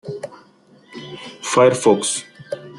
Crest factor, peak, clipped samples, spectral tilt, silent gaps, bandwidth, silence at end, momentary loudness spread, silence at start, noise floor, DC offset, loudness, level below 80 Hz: 20 dB; -2 dBFS; under 0.1%; -4 dB/octave; none; 12 kHz; 0 s; 22 LU; 0.05 s; -51 dBFS; under 0.1%; -17 LUFS; -64 dBFS